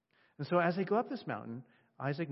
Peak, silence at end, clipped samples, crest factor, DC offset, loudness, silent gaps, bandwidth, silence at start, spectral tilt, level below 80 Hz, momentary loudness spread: -16 dBFS; 0 s; under 0.1%; 20 dB; under 0.1%; -35 LUFS; none; 5.8 kHz; 0.4 s; -6 dB/octave; -82 dBFS; 15 LU